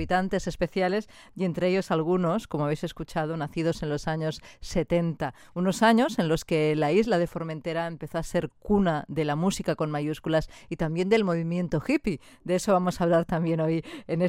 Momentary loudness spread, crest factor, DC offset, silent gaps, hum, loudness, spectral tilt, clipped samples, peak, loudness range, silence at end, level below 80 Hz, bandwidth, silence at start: 9 LU; 18 dB; under 0.1%; none; none; -27 LUFS; -6.5 dB/octave; under 0.1%; -8 dBFS; 3 LU; 0 s; -48 dBFS; 16 kHz; 0 s